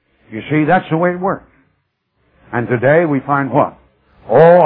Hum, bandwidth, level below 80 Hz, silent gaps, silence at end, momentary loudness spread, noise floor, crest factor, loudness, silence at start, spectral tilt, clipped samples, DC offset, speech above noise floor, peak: none; 4.3 kHz; -54 dBFS; none; 0 s; 12 LU; -65 dBFS; 14 dB; -14 LUFS; 0.3 s; -11.5 dB/octave; under 0.1%; under 0.1%; 53 dB; 0 dBFS